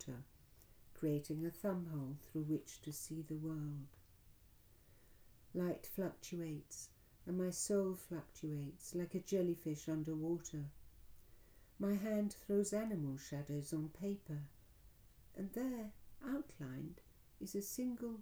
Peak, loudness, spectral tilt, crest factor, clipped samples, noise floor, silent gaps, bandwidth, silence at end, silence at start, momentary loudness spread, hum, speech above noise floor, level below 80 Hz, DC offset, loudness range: -26 dBFS; -44 LUFS; -6 dB/octave; 18 dB; under 0.1%; -66 dBFS; none; over 20 kHz; 0 s; 0 s; 13 LU; none; 24 dB; -68 dBFS; under 0.1%; 6 LU